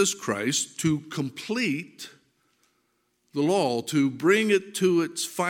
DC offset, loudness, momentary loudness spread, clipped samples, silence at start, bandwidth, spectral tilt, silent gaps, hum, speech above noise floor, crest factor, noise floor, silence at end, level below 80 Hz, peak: under 0.1%; -25 LUFS; 11 LU; under 0.1%; 0 s; 17 kHz; -4 dB/octave; none; none; 47 dB; 18 dB; -72 dBFS; 0 s; -68 dBFS; -8 dBFS